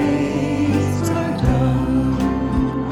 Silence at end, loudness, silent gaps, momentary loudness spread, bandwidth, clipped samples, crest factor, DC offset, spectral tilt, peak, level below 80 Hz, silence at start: 0 s; -19 LUFS; none; 2 LU; 13.5 kHz; under 0.1%; 12 dB; under 0.1%; -7.5 dB/octave; -6 dBFS; -30 dBFS; 0 s